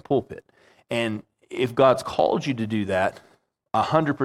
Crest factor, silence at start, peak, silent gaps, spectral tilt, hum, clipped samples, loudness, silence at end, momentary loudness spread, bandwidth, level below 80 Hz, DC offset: 20 dB; 0.1 s; -4 dBFS; none; -6 dB/octave; none; under 0.1%; -24 LUFS; 0 s; 15 LU; 14.5 kHz; -62 dBFS; under 0.1%